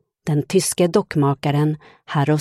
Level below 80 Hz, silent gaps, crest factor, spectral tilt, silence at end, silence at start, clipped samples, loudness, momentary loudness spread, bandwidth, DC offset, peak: -56 dBFS; none; 16 dB; -6 dB/octave; 0 s; 0.25 s; under 0.1%; -20 LUFS; 6 LU; 13.5 kHz; under 0.1%; -4 dBFS